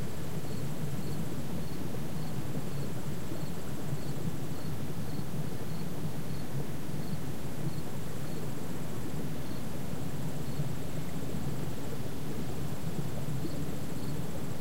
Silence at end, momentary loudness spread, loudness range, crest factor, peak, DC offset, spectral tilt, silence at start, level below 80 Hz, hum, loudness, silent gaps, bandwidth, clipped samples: 0 s; 2 LU; 1 LU; 16 dB; -20 dBFS; 4%; -6 dB/octave; 0 s; -52 dBFS; none; -38 LUFS; none; 16 kHz; under 0.1%